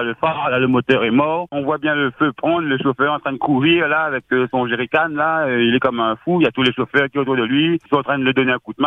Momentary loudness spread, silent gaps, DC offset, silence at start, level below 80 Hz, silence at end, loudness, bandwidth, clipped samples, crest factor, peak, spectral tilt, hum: 4 LU; none; under 0.1%; 0 s; -56 dBFS; 0 s; -17 LUFS; 6 kHz; under 0.1%; 16 dB; -2 dBFS; -7.5 dB/octave; none